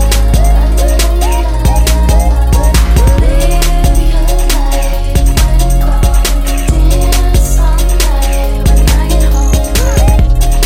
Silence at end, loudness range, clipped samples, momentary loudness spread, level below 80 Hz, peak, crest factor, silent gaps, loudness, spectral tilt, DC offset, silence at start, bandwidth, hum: 0 s; 1 LU; under 0.1%; 3 LU; -8 dBFS; 0 dBFS; 8 dB; none; -11 LUFS; -5 dB/octave; under 0.1%; 0 s; 16 kHz; none